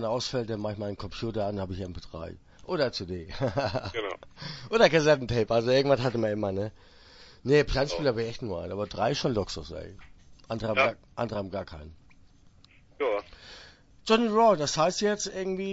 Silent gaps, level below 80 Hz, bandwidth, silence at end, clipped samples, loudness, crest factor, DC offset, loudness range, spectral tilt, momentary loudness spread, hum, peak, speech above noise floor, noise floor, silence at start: none; -50 dBFS; 8 kHz; 0 s; under 0.1%; -28 LUFS; 22 dB; under 0.1%; 7 LU; -5 dB/octave; 18 LU; none; -6 dBFS; 29 dB; -57 dBFS; 0 s